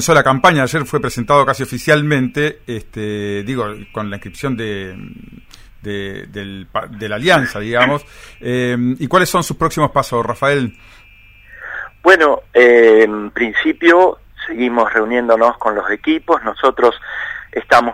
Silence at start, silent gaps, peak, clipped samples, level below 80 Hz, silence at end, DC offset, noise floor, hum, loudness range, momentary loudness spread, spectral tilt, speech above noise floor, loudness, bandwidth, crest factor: 0 s; none; 0 dBFS; under 0.1%; -44 dBFS; 0 s; under 0.1%; -44 dBFS; none; 12 LU; 17 LU; -5 dB/octave; 29 dB; -14 LUFS; 16.5 kHz; 16 dB